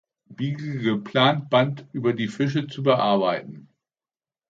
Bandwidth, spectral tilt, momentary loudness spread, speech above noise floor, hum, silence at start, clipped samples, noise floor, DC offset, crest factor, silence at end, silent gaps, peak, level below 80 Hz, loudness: 7.8 kHz; -7 dB/octave; 10 LU; over 67 dB; none; 0.3 s; under 0.1%; under -90 dBFS; under 0.1%; 20 dB; 0.9 s; none; -4 dBFS; -68 dBFS; -23 LUFS